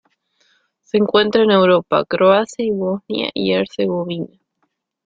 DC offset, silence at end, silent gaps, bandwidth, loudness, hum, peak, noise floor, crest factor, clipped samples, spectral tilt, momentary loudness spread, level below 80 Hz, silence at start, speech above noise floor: under 0.1%; 0.8 s; none; 7.8 kHz; -17 LUFS; none; -2 dBFS; -70 dBFS; 16 dB; under 0.1%; -6 dB/octave; 9 LU; -58 dBFS; 0.95 s; 54 dB